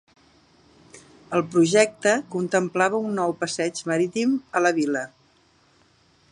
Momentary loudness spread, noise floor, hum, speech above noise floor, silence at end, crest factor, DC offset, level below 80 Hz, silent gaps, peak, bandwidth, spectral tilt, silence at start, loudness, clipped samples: 7 LU; -60 dBFS; none; 38 dB; 1.25 s; 22 dB; under 0.1%; -70 dBFS; none; -4 dBFS; 11.5 kHz; -4.5 dB/octave; 0.95 s; -23 LUFS; under 0.1%